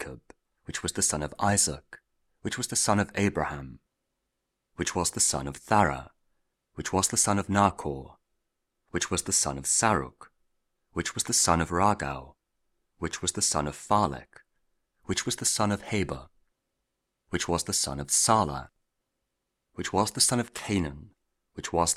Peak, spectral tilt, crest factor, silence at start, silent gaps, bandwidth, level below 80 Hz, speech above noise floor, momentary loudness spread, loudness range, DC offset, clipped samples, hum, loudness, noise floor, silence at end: -6 dBFS; -3 dB/octave; 24 dB; 0 s; none; 16 kHz; -50 dBFS; 54 dB; 15 LU; 4 LU; under 0.1%; under 0.1%; none; -27 LUFS; -82 dBFS; 0 s